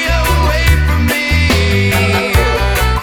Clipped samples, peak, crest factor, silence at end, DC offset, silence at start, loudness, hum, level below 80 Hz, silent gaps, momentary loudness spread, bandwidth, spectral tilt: under 0.1%; 0 dBFS; 12 dB; 0 s; under 0.1%; 0 s; -12 LUFS; none; -16 dBFS; none; 2 LU; over 20 kHz; -5 dB/octave